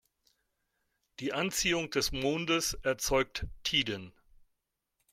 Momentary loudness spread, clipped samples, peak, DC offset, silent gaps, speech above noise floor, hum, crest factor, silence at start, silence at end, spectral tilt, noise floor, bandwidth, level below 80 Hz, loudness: 7 LU; under 0.1%; -14 dBFS; under 0.1%; none; 51 dB; none; 20 dB; 1.2 s; 1.05 s; -2.5 dB/octave; -83 dBFS; 16.5 kHz; -50 dBFS; -31 LUFS